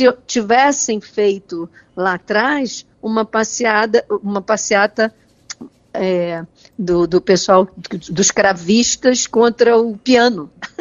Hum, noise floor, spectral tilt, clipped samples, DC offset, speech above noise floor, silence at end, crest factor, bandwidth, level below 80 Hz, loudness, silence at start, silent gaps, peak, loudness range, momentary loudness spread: none; -36 dBFS; -3.5 dB/octave; under 0.1%; under 0.1%; 20 dB; 0.15 s; 16 dB; 8 kHz; -52 dBFS; -15 LUFS; 0 s; none; 0 dBFS; 4 LU; 16 LU